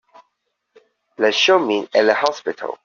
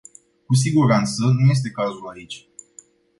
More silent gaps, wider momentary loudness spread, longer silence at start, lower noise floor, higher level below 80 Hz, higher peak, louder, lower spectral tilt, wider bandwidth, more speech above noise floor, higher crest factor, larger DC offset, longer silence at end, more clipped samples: neither; second, 9 LU vs 19 LU; first, 1.2 s vs 0.5 s; first, -73 dBFS vs -50 dBFS; second, -68 dBFS vs -56 dBFS; first, -2 dBFS vs -6 dBFS; about the same, -17 LUFS vs -19 LUFS; second, 0 dB/octave vs -6 dB/octave; second, 7.2 kHz vs 11.5 kHz; first, 55 dB vs 32 dB; about the same, 18 dB vs 16 dB; neither; second, 0.1 s vs 0.8 s; neither